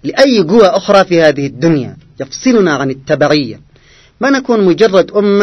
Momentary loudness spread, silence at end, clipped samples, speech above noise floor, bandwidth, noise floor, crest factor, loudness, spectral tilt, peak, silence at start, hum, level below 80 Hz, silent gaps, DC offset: 9 LU; 0 s; 0.6%; 34 dB; 12 kHz; -44 dBFS; 10 dB; -10 LUFS; -5.5 dB/octave; 0 dBFS; 0.05 s; none; -46 dBFS; none; under 0.1%